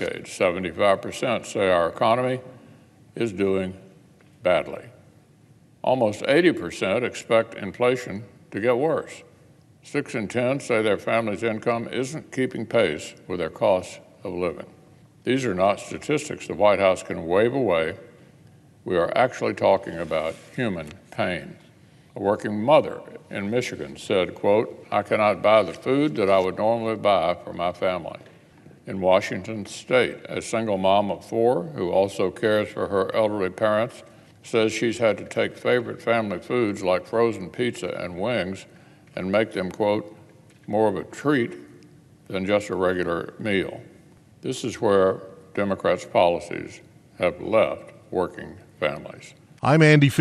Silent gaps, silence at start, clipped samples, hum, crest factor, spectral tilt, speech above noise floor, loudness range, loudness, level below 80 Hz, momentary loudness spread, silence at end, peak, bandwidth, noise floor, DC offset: none; 0 s; under 0.1%; none; 20 dB; -6 dB/octave; 31 dB; 4 LU; -24 LUFS; -60 dBFS; 13 LU; 0 s; -4 dBFS; 12.5 kHz; -54 dBFS; under 0.1%